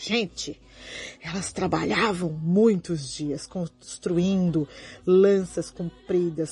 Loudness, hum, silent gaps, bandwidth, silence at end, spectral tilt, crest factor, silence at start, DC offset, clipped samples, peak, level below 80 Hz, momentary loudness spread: -25 LUFS; none; none; 11 kHz; 0 s; -5.5 dB/octave; 16 dB; 0 s; under 0.1%; under 0.1%; -8 dBFS; -54 dBFS; 15 LU